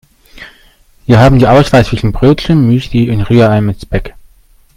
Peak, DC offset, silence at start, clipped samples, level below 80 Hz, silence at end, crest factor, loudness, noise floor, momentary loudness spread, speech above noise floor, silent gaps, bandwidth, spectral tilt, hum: 0 dBFS; under 0.1%; 0.35 s; 0.5%; -26 dBFS; 0.65 s; 10 dB; -9 LUFS; -45 dBFS; 12 LU; 37 dB; none; 13.5 kHz; -7.5 dB/octave; none